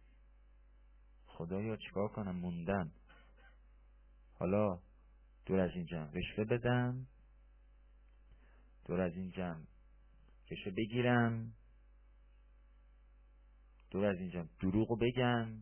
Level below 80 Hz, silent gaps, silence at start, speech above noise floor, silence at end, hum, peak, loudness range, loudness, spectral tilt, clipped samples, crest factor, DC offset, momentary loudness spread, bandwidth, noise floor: -58 dBFS; none; 1.3 s; 27 dB; 0 s; 50 Hz at -60 dBFS; -18 dBFS; 6 LU; -38 LUFS; -6 dB/octave; under 0.1%; 20 dB; under 0.1%; 14 LU; 3.3 kHz; -63 dBFS